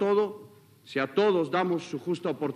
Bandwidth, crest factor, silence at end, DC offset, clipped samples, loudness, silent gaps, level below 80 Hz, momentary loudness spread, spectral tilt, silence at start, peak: 12 kHz; 16 dB; 0 s; under 0.1%; under 0.1%; -28 LUFS; none; -88 dBFS; 9 LU; -6.5 dB/octave; 0 s; -12 dBFS